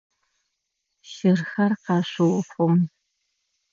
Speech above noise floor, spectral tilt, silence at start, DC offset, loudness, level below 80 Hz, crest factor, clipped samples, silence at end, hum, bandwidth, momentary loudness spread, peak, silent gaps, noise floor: 57 dB; -7.5 dB/octave; 1.1 s; under 0.1%; -23 LUFS; -74 dBFS; 16 dB; under 0.1%; 0.85 s; none; 7.4 kHz; 4 LU; -8 dBFS; none; -78 dBFS